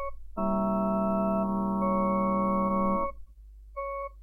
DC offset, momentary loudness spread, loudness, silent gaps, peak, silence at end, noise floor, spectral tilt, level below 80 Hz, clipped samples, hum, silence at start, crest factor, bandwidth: under 0.1%; 10 LU; -28 LUFS; none; -16 dBFS; 0 s; -49 dBFS; -11.5 dB/octave; -46 dBFS; under 0.1%; none; 0 s; 12 dB; 2.8 kHz